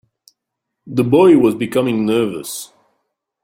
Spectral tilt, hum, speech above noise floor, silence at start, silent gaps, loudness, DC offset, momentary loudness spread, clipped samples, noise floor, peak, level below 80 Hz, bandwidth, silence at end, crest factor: -6 dB/octave; none; 64 dB; 0.85 s; none; -15 LUFS; under 0.1%; 17 LU; under 0.1%; -79 dBFS; -2 dBFS; -58 dBFS; 16.5 kHz; 0.8 s; 16 dB